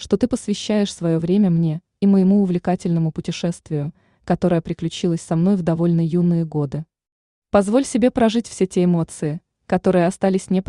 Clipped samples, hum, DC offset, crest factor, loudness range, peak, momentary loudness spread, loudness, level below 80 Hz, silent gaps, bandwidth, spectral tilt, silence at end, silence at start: under 0.1%; none; under 0.1%; 16 dB; 2 LU; -2 dBFS; 9 LU; -20 LUFS; -50 dBFS; 7.12-7.42 s; 11 kHz; -7 dB/octave; 0.05 s; 0 s